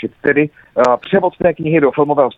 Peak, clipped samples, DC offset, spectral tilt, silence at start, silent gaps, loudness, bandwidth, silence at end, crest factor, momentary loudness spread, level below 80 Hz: 0 dBFS; under 0.1%; under 0.1%; -7.5 dB/octave; 0 s; none; -15 LUFS; 8 kHz; 0.05 s; 14 dB; 3 LU; -48 dBFS